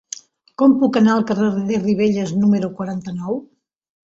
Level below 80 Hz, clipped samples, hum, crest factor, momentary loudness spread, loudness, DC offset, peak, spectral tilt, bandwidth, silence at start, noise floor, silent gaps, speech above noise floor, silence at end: -58 dBFS; under 0.1%; none; 16 dB; 13 LU; -18 LUFS; under 0.1%; -4 dBFS; -6.5 dB/octave; 7.8 kHz; 0.6 s; -38 dBFS; none; 21 dB; 0.7 s